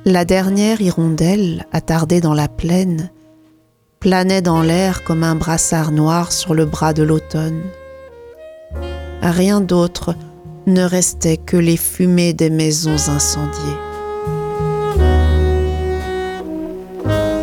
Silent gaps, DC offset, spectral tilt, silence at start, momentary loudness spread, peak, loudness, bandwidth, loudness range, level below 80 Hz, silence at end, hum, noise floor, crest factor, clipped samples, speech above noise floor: none; under 0.1%; -5.5 dB/octave; 0 s; 11 LU; 0 dBFS; -16 LUFS; 17.5 kHz; 4 LU; -26 dBFS; 0 s; none; -55 dBFS; 16 dB; under 0.1%; 40 dB